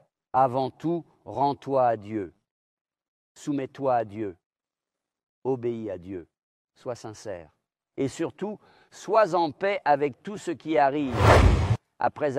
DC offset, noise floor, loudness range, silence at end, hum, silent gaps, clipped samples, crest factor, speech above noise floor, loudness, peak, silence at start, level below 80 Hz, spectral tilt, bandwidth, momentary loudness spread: under 0.1%; under -90 dBFS; 13 LU; 0 s; none; 2.51-2.85 s, 3.08-3.35 s, 4.46-4.50 s, 5.23-5.42 s, 6.43-6.68 s; under 0.1%; 22 dB; over 65 dB; -26 LUFS; -4 dBFS; 0.35 s; -38 dBFS; -6.5 dB/octave; 15 kHz; 17 LU